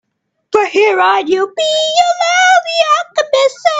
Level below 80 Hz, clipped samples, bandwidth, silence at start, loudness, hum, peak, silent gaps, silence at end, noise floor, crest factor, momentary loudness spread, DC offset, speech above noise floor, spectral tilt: -64 dBFS; under 0.1%; 9.2 kHz; 0.5 s; -12 LUFS; none; 0 dBFS; none; 0 s; -50 dBFS; 12 dB; 5 LU; under 0.1%; 38 dB; -0.5 dB/octave